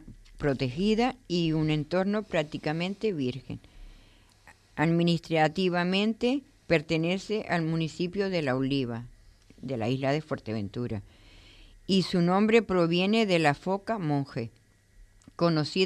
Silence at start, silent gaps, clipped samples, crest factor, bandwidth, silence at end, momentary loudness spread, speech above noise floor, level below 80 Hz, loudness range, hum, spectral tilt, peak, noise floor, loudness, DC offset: 0 s; none; under 0.1%; 20 dB; 11 kHz; 0 s; 11 LU; 30 dB; -54 dBFS; 5 LU; none; -6.5 dB/octave; -8 dBFS; -57 dBFS; -28 LUFS; under 0.1%